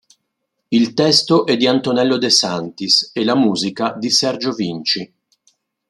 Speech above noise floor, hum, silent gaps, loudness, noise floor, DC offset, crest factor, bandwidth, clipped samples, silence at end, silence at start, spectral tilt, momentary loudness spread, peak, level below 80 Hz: 58 dB; none; none; -16 LUFS; -74 dBFS; under 0.1%; 18 dB; 12.5 kHz; under 0.1%; 0.85 s; 0.7 s; -3.5 dB/octave; 8 LU; 0 dBFS; -62 dBFS